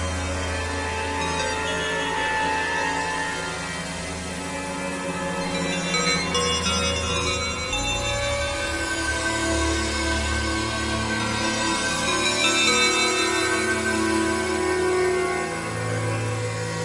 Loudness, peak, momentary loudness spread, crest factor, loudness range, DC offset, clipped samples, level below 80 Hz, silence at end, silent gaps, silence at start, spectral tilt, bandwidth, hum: -23 LUFS; -6 dBFS; 8 LU; 18 dB; 5 LU; under 0.1%; under 0.1%; -40 dBFS; 0 s; none; 0 s; -3 dB/octave; 11.5 kHz; none